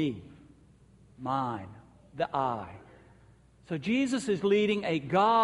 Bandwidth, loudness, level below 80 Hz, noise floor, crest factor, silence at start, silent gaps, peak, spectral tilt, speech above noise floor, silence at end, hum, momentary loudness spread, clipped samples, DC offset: 11.5 kHz; -30 LUFS; -64 dBFS; -59 dBFS; 18 dB; 0 s; none; -12 dBFS; -6 dB/octave; 30 dB; 0 s; none; 19 LU; under 0.1%; under 0.1%